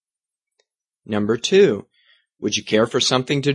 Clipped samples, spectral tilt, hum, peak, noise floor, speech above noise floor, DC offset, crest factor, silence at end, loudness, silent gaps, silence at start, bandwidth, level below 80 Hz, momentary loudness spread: under 0.1%; -4 dB/octave; none; -2 dBFS; -89 dBFS; 71 dB; under 0.1%; 18 dB; 0 s; -19 LUFS; none; 1.1 s; 11 kHz; -62 dBFS; 12 LU